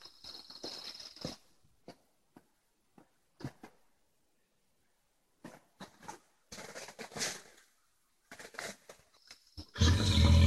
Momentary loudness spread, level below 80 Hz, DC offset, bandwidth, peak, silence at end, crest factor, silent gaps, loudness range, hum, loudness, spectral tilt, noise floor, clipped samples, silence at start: 28 LU; -44 dBFS; under 0.1%; 12.5 kHz; -14 dBFS; 0 s; 24 dB; none; 19 LU; none; -36 LUFS; -5 dB/octave; -78 dBFS; under 0.1%; 0.25 s